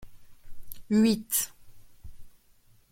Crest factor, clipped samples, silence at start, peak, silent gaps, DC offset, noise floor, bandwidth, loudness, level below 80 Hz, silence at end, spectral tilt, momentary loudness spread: 18 dB; under 0.1%; 0 s; -12 dBFS; none; under 0.1%; -60 dBFS; 16.5 kHz; -26 LUFS; -52 dBFS; 0.6 s; -4 dB/octave; 24 LU